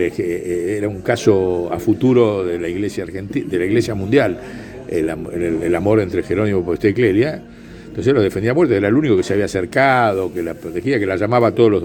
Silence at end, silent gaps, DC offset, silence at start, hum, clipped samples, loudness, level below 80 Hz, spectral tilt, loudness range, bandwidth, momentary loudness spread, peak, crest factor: 0 s; none; under 0.1%; 0 s; none; under 0.1%; -17 LUFS; -44 dBFS; -7 dB/octave; 3 LU; 17.5 kHz; 10 LU; 0 dBFS; 16 dB